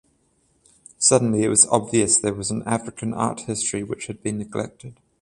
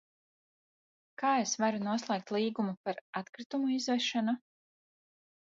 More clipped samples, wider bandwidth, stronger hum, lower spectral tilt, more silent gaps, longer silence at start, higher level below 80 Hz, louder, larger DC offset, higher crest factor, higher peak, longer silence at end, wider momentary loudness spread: neither; first, 11.5 kHz vs 7.8 kHz; neither; about the same, -3.5 dB/octave vs -4 dB/octave; second, none vs 2.77-2.84 s, 3.01-3.13 s, 3.29-3.33 s, 3.46-3.50 s; second, 1 s vs 1.2 s; first, -54 dBFS vs -84 dBFS; first, -21 LUFS vs -33 LUFS; neither; first, 22 dB vs 16 dB; first, 0 dBFS vs -18 dBFS; second, 0.3 s vs 1.2 s; first, 14 LU vs 9 LU